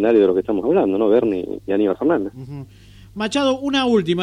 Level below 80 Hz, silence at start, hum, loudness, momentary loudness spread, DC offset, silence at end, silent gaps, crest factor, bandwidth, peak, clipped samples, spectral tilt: -50 dBFS; 0 s; none; -18 LUFS; 15 LU; under 0.1%; 0 s; none; 14 dB; 10.5 kHz; -4 dBFS; under 0.1%; -6 dB/octave